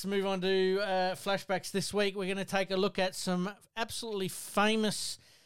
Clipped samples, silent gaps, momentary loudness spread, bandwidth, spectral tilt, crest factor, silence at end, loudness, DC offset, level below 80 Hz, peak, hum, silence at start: under 0.1%; none; 7 LU; 16.5 kHz; -4 dB/octave; 16 dB; 0 s; -32 LUFS; 0.3%; -64 dBFS; -16 dBFS; none; 0 s